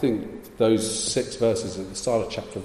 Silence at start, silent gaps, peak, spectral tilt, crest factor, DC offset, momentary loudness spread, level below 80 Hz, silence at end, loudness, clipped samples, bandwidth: 0 s; none; -8 dBFS; -4.5 dB/octave; 16 dB; under 0.1%; 9 LU; -52 dBFS; 0 s; -25 LUFS; under 0.1%; 15 kHz